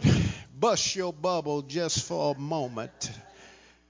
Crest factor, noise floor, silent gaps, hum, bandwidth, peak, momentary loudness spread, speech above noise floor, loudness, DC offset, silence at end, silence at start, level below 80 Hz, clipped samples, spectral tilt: 18 dB; -54 dBFS; none; none; 7.8 kHz; -10 dBFS; 11 LU; 25 dB; -29 LUFS; under 0.1%; 0.4 s; 0 s; -46 dBFS; under 0.1%; -4.5 dB/octave